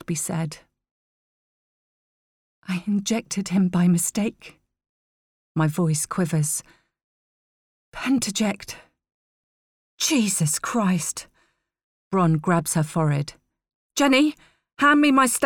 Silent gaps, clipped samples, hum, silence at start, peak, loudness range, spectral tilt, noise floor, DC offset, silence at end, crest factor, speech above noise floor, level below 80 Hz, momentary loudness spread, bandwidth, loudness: 0.91-2.62 s, 4.89-5.55 s, 7.04-7.92 s, 9.14-9.98 s, 11.83-12.11 s, 13.75-13.90 s; under 0.1%; none; 0.1 s; -6 dBFS; 6 LU; -4.5 dB/octave; -67 dBFS; under 0.1%; 0 s; 20 dB; 45 dB; -60 dBFS; 14 LU; 19.5 kHz; -22 LUFS